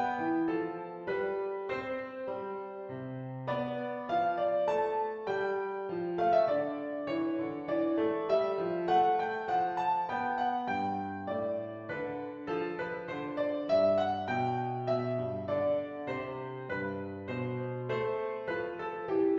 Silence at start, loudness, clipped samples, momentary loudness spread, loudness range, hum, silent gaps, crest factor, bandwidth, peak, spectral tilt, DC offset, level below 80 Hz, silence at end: 0 s; -33 LUFS; under 0.1%; 10 LU; 5 LU; none; none; 16 dB; 7.4 kHz; -16 dBFS; -8 dB/octave; under 0.1%; -70 dBFS; 0 s